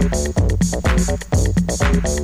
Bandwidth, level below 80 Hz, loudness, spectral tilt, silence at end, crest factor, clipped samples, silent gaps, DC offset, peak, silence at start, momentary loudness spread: 15.5 kHz; -22 dBFS; -18 LUFS; -5.5 dB/octave; 0 s; 12 dB; under 0.1%; none; under 0.1%; -4 dBFS; 0 s; 2 LU